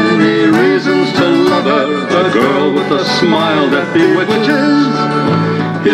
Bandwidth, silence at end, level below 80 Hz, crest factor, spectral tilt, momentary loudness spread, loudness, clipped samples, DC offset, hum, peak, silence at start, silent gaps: 13.5 kHz; 0 s; -52 dBFS; 10 dB; -6 dB/octave; 3 LU; -11 LUFS; under 0.1%; under 0.1%; none; 0 dBFS; 0 s; none